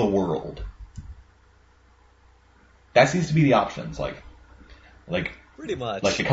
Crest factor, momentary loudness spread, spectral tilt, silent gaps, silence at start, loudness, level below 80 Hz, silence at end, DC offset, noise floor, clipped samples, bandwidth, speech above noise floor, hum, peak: 22 dB; 22 LU; -5.5 dB/octave; none; 0 s; -24 LUFS; -46 dBFS; 0 s; under 0.1%; -57 dBFS; under 0.1%; 8 kHz; 34 dB; none; -4 dBFS